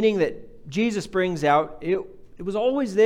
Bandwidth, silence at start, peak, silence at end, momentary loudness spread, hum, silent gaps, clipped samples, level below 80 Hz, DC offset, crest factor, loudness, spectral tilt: 12.5 kHz; 0 s; -6 dBFS; 0 s; 12 LU; none; none; under 0.1%; -52 dBFS; under 0.1%; 16 dB; -24 LUFS; -6 dB/octave